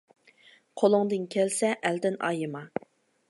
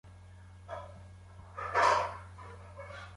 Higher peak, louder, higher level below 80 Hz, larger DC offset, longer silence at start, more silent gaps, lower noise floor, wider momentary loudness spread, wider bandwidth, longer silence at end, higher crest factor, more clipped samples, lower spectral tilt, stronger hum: first, -8 dBFS vs -14 dBFS; first, -27 LUFS vs -30 LUFS; second, -80 dBFS vs -56 dBFS; neither; first, 0.75 s vs 0.05 s; neither; first, -59 dBFS vs -52 dBFS; second, 14 LU vs 26 LU; about the same, 11.5 kHz vs 11.5 kHz; first, 0.6 s vs 0 s; about the same, 20 dB vs 22 dB; neither; about the same, -4.5 dB/octave vs -3.5 dB/octave; neither